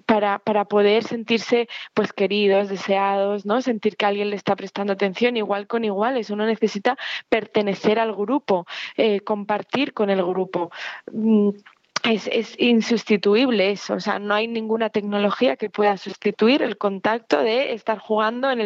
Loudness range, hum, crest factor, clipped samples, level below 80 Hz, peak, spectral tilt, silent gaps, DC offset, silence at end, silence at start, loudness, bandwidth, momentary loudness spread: 2 LU; none; 16 dB; under 0.1%; -72 dBFS; -6 dBFS; -5.5 dB/octave; none; under 0.1%; 0 s; 0.1 s; -21 LUFS; 7.6 kHz; 6 LU